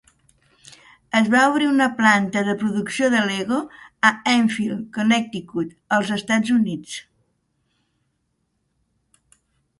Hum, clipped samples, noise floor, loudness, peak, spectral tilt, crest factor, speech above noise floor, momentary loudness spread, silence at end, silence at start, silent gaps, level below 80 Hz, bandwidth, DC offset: none; under 0.1%; -72 dBFS; -20 LUFS; 0 dBFS; -4.5 dB/octave; 22 dB; 52 dB; 12 LU; 2.8 s; 1.15 s; none; -64 dBFS; 11.5 kHz; under 0.1%